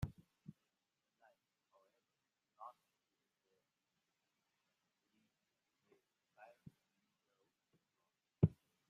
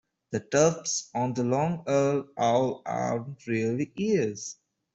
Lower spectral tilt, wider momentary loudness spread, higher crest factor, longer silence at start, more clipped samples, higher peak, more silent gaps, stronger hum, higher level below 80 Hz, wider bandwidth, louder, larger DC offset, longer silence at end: first, -10 dB/octave vs -5 dB/octave; first, 25 LU vs 9 LU; first, 32 dB vs 18 dB; second, 0 s vs 0.3 s; neither; second, -18 dBFS vs -10 dBFS; neither; neither; about the same, -68 dBFS vs -66 dBFS; second, 6.8 kHz vs 8.2 kHz; second, -40 LUFS vs -27 LUFS; neither; about the same, 0.4 s vs 0.4 s